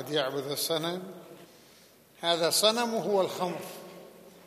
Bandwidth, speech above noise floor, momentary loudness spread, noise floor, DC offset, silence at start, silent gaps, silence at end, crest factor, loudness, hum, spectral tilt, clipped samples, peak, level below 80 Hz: 15 kHz; 29 dB; 22 LU; -57 dBFS; under 0.1%; 0 s; none; 0.05 s; 22 dB; -28 LUFS; none; -2.5 dB/octave; under 0.1%; -10 dBFS; -80 dBFS